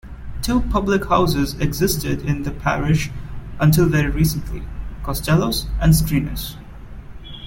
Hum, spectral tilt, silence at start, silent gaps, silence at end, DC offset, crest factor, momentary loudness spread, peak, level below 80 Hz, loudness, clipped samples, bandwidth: none; -5.5 dB/octave; 0.05 s; none; 0 s; under 0.1%; 16 dB; 19 LU; -4 dBFS; -28 dBFS; -19 LUFS; under 0.1%; 17 kHz